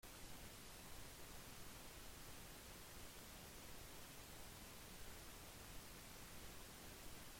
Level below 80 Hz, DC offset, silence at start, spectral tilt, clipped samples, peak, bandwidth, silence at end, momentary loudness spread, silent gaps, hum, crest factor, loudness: -64 dBFS; under 0.1%; 0.05 s; -2.5 dB/octave; under 0.1%; -44 dBFS; 16.5 kHz; 0 s; 0 LU; none; none; 14 dB; -57 LUFS